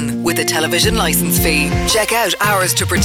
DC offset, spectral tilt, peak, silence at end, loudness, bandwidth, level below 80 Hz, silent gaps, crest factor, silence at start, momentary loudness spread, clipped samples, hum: under 0.1%; -3 dB/octave; -4 dBFS; 0 s; -14 LUFS; 19.5 kHz; -28 dBFS; none; 12 dB; 0 s; 2 LU; under 0.1%; none